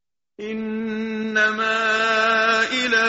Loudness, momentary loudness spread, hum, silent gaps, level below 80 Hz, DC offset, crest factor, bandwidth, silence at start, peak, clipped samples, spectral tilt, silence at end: -20 LUFS; 11 LU; none; none; -62 dBFS; under 0.1%; 16 dB; 8 kHz; 0.4 s; -6 dBFS; under 0.1%; -0.5 dB/octave; 0 s